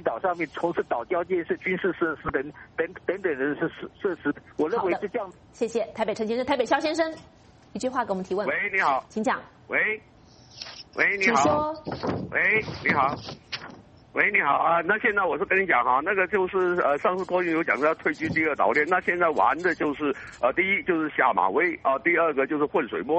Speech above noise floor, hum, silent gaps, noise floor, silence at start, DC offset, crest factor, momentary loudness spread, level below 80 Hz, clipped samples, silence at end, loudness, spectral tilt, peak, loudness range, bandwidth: 21 dB; none; none; -46 dBFS; 0 s; under 0.1%; 20 dB; 10 LU; -58 dBFS; under 0.1%; 0 s; -25 LUFS; -5 dB/octave; -6 dBFS; 5 LU; 8.4 kHz